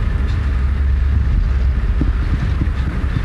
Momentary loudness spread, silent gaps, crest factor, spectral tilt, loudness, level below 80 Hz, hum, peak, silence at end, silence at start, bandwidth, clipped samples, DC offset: 2 LU; none; 12 dB; -8 dB/octave; -19 LUFS; -16 dBFS; none; -4 dBFS; 0 s; 0 s; 5.6 kHz; under 0.1%; under 0.1%